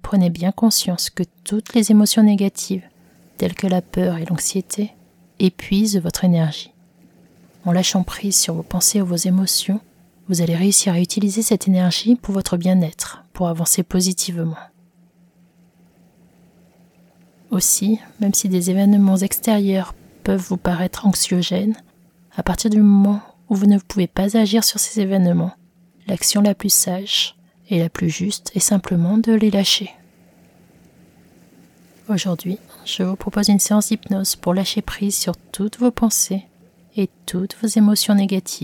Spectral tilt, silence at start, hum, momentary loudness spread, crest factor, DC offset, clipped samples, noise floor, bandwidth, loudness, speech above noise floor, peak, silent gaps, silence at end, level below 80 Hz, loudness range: -4.5 dB/octave; 0.05 s; none; 11 LU; 18 dB; under 0.1%; under 0.1%; -54 dBFS; 18.5 kHz; -18 LUFS; 36 dB; -2 dBFS; none; 0 s; -46 dBFS; 5 LU